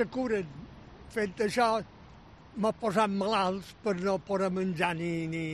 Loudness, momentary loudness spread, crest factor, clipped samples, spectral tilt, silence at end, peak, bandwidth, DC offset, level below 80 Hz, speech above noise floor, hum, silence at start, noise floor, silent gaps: -30 LUFS; 16 LU; 18 dB; under 0.1%; -6 dB/octave; 0 s; -12 dBFS; 13 kHz; under 0.1%; -58 dBFS; 23 dB; none; 0 s; -52 dBFS; none